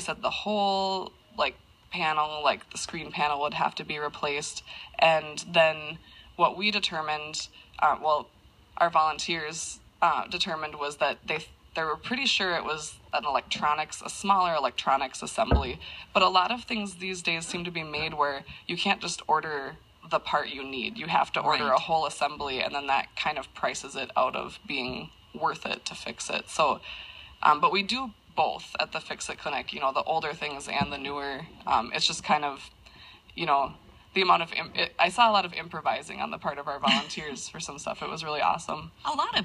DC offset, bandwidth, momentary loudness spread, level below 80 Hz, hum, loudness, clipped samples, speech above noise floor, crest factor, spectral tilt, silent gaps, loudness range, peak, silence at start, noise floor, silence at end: under 0.1%; 13 kHz; 11 LU; -48 dBFS; none; -28 LUFS; under 0.1%; 23 dB; 22 dB; -3 dB/octave; none; 4 LU; -6 dBFS; 0 s; -51 dBFS; 0 s